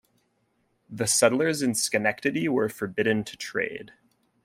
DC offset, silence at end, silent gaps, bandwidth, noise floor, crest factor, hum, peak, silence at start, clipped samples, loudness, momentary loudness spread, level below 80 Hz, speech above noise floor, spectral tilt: under 0.1%; 0.55 s; none; 16 kHz; -71 dBFS; 22 dB; none; -6 dBFS; 0.9 s; under 0.1%; -25 LUFS; 10 LU; -68 dBFS; 45 dB; -3.5 dB/octave